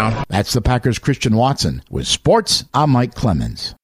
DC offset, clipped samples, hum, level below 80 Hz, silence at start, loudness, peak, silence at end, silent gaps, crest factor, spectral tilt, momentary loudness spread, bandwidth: under 0.1%; under 0.1%; none; -32 dBFS; 0 s; -17 LUFS; -2 dBFS; 0.1 s; none; 16 dB; -5 dB/octave; 6 LU; 15 kHz